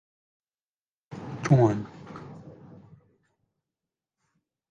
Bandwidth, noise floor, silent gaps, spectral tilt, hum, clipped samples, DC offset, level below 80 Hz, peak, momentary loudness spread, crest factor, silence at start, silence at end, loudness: 7.4 kHz; under -90 dBFS; none; -8 dB/octave; none; under 0.1%; under 0.1%; -62 dBFS; -8 dBFS; 25 LU; 24 dB; 1.1 s; 2.2 s; -24 LUFS